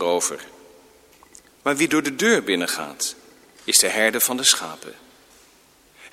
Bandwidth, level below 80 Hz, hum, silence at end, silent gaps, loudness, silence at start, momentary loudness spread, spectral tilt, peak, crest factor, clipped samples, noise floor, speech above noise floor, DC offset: 16.5 kHz; -66 dBFS; none; 0.05 s; none; -20 LUFS; 0 s; 18 LU; -1 dB/octave; 0 dBFS; 22 dB; under 0.1%; -55 dBFS; 33 dB; under 0.1%